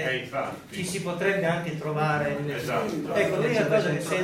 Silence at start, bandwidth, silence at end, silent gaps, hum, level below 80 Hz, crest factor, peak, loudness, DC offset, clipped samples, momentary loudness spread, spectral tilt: 0 s; 16 kHz; 0 s; none; none; -60 dBFS; 16 dB; -10 dBFS; -27 LUFS; under 0.1%; under 0.1%; 8 LU; -5.5 dB/octave